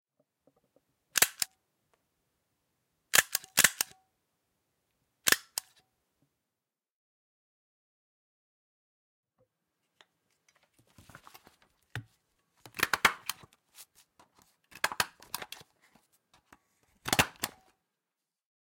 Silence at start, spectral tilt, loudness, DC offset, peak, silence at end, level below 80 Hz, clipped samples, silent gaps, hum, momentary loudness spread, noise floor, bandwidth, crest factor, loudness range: 1.15 s; -0.5 dB/octave; -29 LUFS; under 0.1%; -6 dBFS; 1.15 s; -68 dBFS; under 0.1%; 6.91-9.23 s; none; 20 LU; -90 dBFS; 16.5 kHz; 32 dB; 10 LU